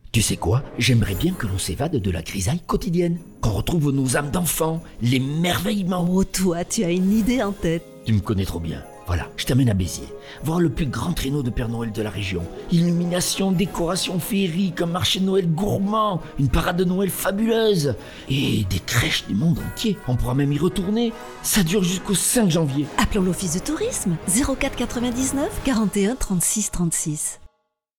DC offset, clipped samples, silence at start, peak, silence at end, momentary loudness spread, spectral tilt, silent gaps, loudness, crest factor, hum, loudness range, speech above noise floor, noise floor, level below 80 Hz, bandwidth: under 0.1%; under 0.1%; 0.05 s; -4 dBFS; 0.5 s; 7 LU; -5 dB/octave; none; -22 LUFS; 16 dB; none; 3 LU; 49 dB; -71 dBFS; -36 dBFS; 19 kHz